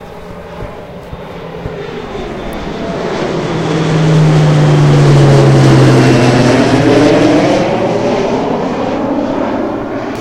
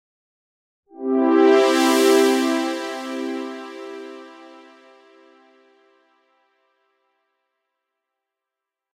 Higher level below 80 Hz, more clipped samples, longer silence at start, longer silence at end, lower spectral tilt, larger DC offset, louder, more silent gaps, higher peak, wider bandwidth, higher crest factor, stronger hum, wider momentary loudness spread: first, -32 dBFS vs -82 dBFS; first, 0.3% vs under 0.1%; second, 0 s vs 1 s; second, 0 s vs 4.65 s; first, -7 dB/octave vs -2 dB/octave; neither; first, -10 LUFS vs -18 LUFS; neither; first, 0 dBFS vs -4 dBFS; second, 11 kHz vs 16 kHz; second, 10 dB vs 18 dB; neither; about the same, 20 LU vs 21 LU